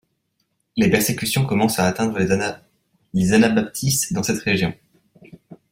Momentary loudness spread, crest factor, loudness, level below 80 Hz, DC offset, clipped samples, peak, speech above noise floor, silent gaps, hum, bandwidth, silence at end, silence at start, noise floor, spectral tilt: 10 LU; 18 dB; -20 LUFS; -52 dBFS; under 0.1%; under 0.1%; -2 dBFS; 52 dB; none; none; 16.5 kHz; 0.15 s; 0.75 s; -71 dBFS; -4.5 dB/octave